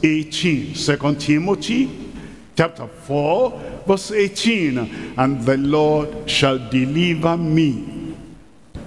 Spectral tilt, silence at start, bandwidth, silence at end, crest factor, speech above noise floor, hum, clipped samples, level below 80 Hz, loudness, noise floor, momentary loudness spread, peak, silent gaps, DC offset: -5.5 dB/octave; 0 s; 12 kHz; 0 s; 16 dB; 26 dB; none; under 0.1%; -46 dBFS; -19 LUFS; -44 dBFS; 11 LU; -2 dBFS; none; 0.3%